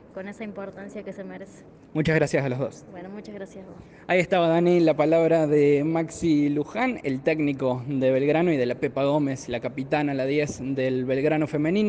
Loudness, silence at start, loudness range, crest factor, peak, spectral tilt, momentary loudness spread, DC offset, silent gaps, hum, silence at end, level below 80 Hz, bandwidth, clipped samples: -23 LUFS; 0.15 s; 7 LU; 16 dB; -8 dBFS; -7 dB/octave; 18 LU; under 0.1%; none; none; 0 s; -58 dBFS; 9.4 kHz; under 0.1%